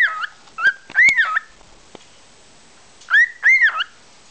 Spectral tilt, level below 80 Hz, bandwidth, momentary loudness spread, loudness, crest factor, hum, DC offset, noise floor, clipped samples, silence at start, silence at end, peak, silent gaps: 0.5 dB/octave; -62 dBFS; 8 kHz; 15 LU; -15 LUFS; 16 dB; none; 0.3%; -48 dBFS; under 0.1%; 0 s; 0.45 s; -4 dBFS; none